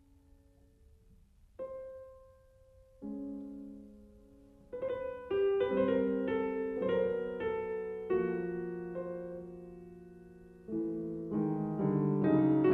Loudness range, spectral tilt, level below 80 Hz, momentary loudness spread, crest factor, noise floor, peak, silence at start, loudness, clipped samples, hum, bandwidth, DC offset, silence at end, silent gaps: 14 LU; -10 dB/octave; -62 dBFS; 21 LU; 20 dB; -63 dBFS; -16 dBFS; 1.6 s; -34 LUFS; under 0.1%; none; 4.1 kHz; under 0.1%; 0 s; none